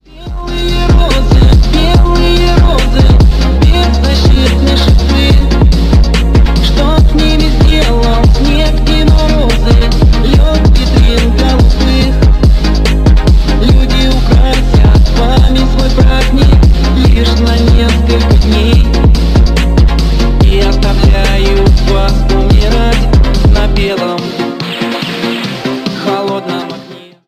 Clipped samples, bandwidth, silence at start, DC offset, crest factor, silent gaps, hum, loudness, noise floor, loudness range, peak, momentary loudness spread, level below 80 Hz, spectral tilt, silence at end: under 0.1%; 13 kHz; 0.15 s; 0.4%; 6 dB; none; none; -9 LUFS; -30 dBFS; 2 LU; 0 dBFS; 7 LU; -8 dBFS; -6.5 dB/octave; 0.3 s